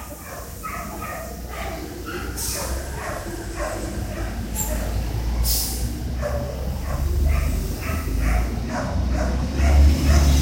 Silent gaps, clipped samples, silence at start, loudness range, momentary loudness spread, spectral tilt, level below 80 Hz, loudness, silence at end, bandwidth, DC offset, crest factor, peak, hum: none; under 0.1%; 0 s; 7 LU; 13 LU; -5 dB/octave; -24 dBFS; -25 LUFS; 0 s; 16.5 kHz; under 0.1%; 18 dB; -6 dBFS; none